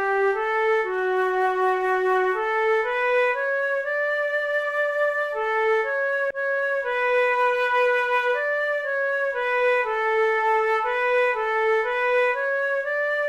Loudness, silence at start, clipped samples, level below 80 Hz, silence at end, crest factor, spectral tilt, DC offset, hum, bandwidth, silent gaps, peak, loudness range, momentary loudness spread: -22 LUFS; 0 s; under 0.1%; -60 dBFS; 0 s; 10 dB; -3 dB/octave; under 0.1%; none; 13 kHz; none; -12 dBFS; 1 LU; 3 LU